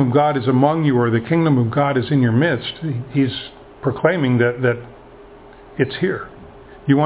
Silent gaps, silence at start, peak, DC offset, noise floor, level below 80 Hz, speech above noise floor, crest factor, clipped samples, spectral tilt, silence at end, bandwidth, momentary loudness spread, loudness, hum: none; 0 s; 0 dBFS; under 0.1%; -42 dBFS; -50 dBFS; 24 dB; 18 dB; under 0.1%; -11.5 dB/octave; 0 s; 4 kHz; 12 LU; -18 LUFS; none